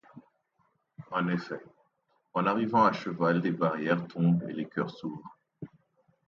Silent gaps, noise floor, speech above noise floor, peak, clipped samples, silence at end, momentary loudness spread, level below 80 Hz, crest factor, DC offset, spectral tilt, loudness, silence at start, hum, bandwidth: none; -74 dBFS; 46 dB; -10 dBFS; under 0.1%; 0.6 s; 20 LU; -74 dBFS; 22 dB; under 0.1%; -8.5 dB/octave; -29 LUFS; 0.15 s; none; 6.8 kHz